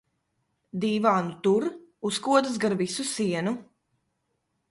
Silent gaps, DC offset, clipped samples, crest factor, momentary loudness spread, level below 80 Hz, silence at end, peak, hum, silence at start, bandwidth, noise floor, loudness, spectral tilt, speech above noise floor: none; under 0.1%; under 0.1%; 20 dB; 11 LU; -70 dBFS; 1.1 s; -6 dBFS; none; 0.75 s; 11.5 kHz; -77 dBFS; -26 LUFS; -5 dB/octave; 51 dB